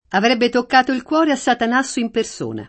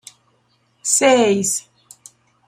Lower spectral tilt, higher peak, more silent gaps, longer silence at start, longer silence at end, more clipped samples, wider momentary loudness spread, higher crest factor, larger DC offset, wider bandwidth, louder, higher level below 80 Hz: about the same, -3.5 dB/octave vs -2.5 dB/octave; about the same, -2 dBFS vs -2 dBFS; neither; second, 0.1 s vs 0.85 s; second, 0 s vs 0.85 s; neither; second, 6 LU vs 12 LU; about the same, 16 dB vs 18 dB; neither; second, 8.8 kHz vs 15.5 kHz; about the same, -17 LUFS vs -16 LUFS; first, -56 dBFS vs -64 dBFS